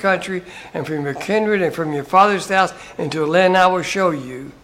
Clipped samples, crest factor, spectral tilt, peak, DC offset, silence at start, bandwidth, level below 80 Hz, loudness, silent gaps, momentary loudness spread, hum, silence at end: under 0.1%; 18 dB; -5 dB/octave; 0 dBFS; under 0.1%; 0 s; 16 kHz; -54 dBFS; -18 LUFS; none; 14 LU; none; 0.1 s